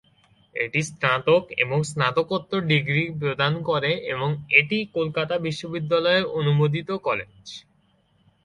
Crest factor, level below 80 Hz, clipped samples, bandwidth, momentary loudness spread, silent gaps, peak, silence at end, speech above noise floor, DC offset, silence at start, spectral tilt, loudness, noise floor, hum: 22 dB; -60 dBFS; under 0.1%; 11.5 kHz; 10 LU; none; -2 dBFS; 0.85 s; 40 dB; under 0.1%; 0.55 s; -5.5 dB/octave; -23 LUFS; -63 dBFS; none